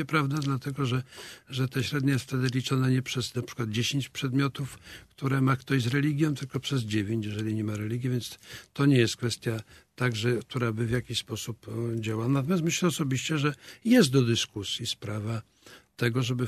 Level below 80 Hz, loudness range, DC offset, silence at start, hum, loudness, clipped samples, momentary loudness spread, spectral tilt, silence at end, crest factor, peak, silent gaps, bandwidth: -60 dBFS; 3 LU; under 0.1%; 0 s; none; -28 LUFS; under 0.1%; 11 LU; -5.5 dB/octave; 0 s; 18 dB; -10 dBFS; none; 13.5 kHz